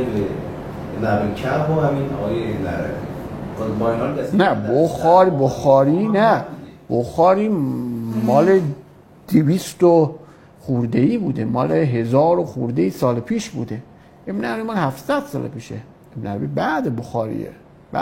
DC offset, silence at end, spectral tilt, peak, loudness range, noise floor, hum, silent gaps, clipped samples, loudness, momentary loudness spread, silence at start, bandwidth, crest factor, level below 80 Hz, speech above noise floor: under 0.1%; 0 s; -7.5 dB/octave; -2 dBFS; 8 LU; -44 dBFS; none; none; under 0.1%; -19 LUFS; 15 LU; 0 s; 16.5 kHz; 18 dB; -46 dBFS; 26 dB